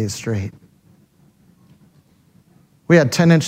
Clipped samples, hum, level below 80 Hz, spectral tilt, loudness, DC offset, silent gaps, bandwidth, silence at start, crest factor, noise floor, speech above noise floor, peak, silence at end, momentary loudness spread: under 0.1%; none; -58 dBFS; -6 dB/octave; -17 LUFS; under 0.1%; none; 15 kHz; 0 s; 20 dB; -54 dBFS; 39 dB; 0 dBFS; 0 s; 13 LU